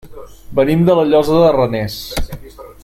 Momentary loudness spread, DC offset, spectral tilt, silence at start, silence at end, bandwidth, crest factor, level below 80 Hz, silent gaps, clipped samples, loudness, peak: 14 LU; under 0.1%; -7 dB/octave; 0.05 s; 0.1 s; 16 kHz; 14 dB; -32 dBFS; none; under 0.1%; -14 LUFS; 0 dBFS